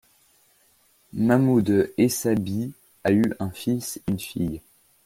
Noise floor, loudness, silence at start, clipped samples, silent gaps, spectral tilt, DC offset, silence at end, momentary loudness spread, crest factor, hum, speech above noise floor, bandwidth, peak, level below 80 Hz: -61 dBFS; -24 LUFS; 1.15 s; under 0.1%; none; -6 dB/octave; under 0.1%; 0.45 s; 11 LU; 18 dB; none; 39 dB; 16.5 kHz; -6 dBFS; -54 dBFS